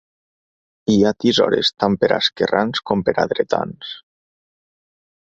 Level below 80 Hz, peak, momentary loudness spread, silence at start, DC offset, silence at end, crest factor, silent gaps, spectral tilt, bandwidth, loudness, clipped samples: -54 dBFS; -2 dBFS; 12 LU; 0.9 s; under 0.1%; 1.25 s; 18 dB; none; -5 dB/octave; 7.8 kHz; -18 LUFS; under 0.1%